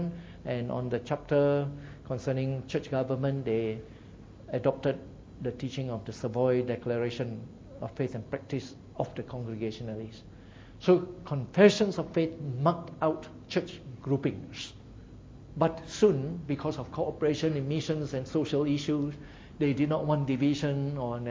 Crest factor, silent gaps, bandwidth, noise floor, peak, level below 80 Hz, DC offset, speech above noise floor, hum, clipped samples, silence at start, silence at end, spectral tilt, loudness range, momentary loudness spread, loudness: 24 dB; none; 7.8 kHz; -49 dBFS; -6 dBFS; -56 dBFS; under 0.1%; 20 dB; none; under 0.1%; 0 s; 0 s; -7 dB/octave; 6 LU; 17 LU; -30 LUFS